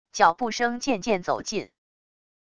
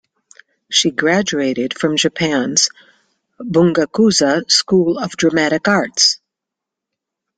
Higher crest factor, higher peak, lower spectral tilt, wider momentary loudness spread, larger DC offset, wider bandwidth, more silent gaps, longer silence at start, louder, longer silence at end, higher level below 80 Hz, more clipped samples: first, 22 dB vs 16 dB; second, -4 dBFS vs 0 dBFS; about the same, -3.5 dB/octave vs -3 dB/octave; first, 11 LU vs 6 LU; neither; about the same, 11 kHz vs 10 kHz; neither; second, 0.05 s vs 0.7 s; second, -25 LUFS vs -15 LUFS; second, 0.65 s vs 1.2 s; about the same, -58 dBFS vs -56 dBFS; neither